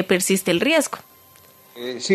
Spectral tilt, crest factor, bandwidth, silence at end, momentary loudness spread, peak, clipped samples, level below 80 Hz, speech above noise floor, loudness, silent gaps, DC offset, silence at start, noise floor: -3.5 dB/octave; 18 dB; 14 kHz; 0 s; 15 LU; -4 dBFS; under 0.1%; -66 dBFS; 30 dB; -20 LUFS; none; under 0.1%; 0 s; -50 dBFS